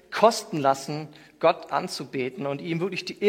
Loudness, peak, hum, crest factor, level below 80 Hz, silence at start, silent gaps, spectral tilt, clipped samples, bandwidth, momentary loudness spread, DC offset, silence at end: -26 LUFS; -4 dBFS; none; 22 dB; -72 dBFS; 0.1 s; none; -4.5 dB/octave; under 0.1%; 16.5 kHz; 11 LU; under 0.1%; 0 s